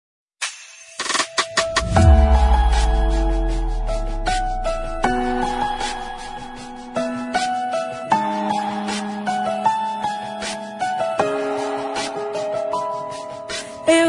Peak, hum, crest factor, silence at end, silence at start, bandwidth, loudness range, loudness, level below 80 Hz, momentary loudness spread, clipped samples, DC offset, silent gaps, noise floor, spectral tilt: -2 dBFS; none; 18 dB; 0 s; 0.4 s; 11 kHz; 6 LU; -22 LUFS; -24 dBFS; 11 LU; under 0.1%; under 0.1%; none; -40 dBFS; -5 dB/octave